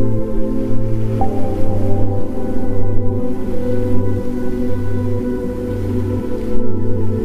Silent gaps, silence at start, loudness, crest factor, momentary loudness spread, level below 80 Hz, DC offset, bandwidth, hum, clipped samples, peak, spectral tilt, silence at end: none; 0 s; -21 LUFS; 12 dB; 3 LU; -24 dBFS; under 0.1%; 3.6 kHz; none; under 0.1%; 0 dBFS; -9.5 dB/octave; 0 s